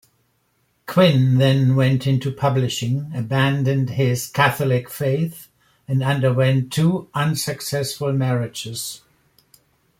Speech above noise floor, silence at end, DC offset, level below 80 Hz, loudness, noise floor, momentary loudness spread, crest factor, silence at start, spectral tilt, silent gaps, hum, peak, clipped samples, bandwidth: 47 dB; 1.05 s; under 0.1%; -56 dBFS; -20 LUFS; -66 dBFS; 9 LU; 18 dB; 0.9 s; -6 dB/octave; none; none; -2 dBFS; under 0.1%; 16 kHz